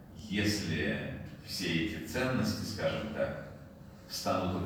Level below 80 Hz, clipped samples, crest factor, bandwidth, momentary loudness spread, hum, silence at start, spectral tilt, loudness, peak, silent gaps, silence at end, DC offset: -56 dBFS; under 0.1%; 16 dB; over 20 kHz; 13 LU; none; 0 s; -5 dB/octave; -34 LUFS; -18 dBFS; none; 0 s; under 0.1%